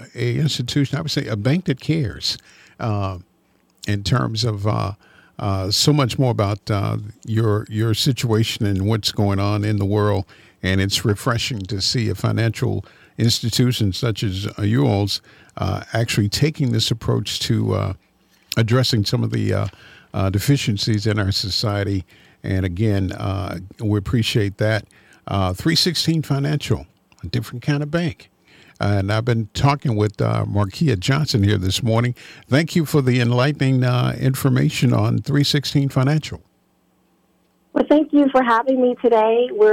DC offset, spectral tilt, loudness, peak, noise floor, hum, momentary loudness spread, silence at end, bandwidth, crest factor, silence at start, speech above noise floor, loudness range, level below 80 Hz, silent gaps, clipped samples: under 0.1%; -5.5 dB/octave; -20 LUFS; -4 dBFS; -62 dBFS; none; 9 LU; 0 s; 16.5 kHz; 16 dB; 0 s; 43 dB; 4 LU; -48 dBFS; none; under 0.1%